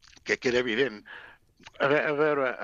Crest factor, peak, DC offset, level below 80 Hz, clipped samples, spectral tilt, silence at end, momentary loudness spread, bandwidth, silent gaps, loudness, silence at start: 18 dB; -10 dBFS; under 0.1%; -64 dBFS; under 0.1%; -4.5 dB/octave; 0 s; 19 LU; 7.8 kHz; none; -26 LUFS; 0.25 s